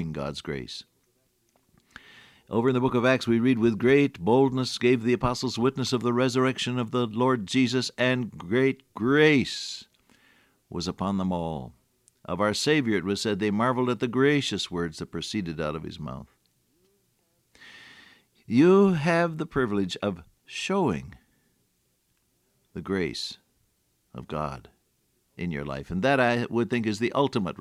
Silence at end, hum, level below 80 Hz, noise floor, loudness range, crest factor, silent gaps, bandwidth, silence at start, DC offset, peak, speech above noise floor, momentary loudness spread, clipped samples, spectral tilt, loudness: 0.05 s; none; -56 dBFS; -71 dBFS; 12 LU; 18 dB; none; 13.5 kHz; 0 s; under 0.1%; -8 dBFS; 46 dB; 15 LU; under 0.1%; -5.5 dB/octave; -25 LUFS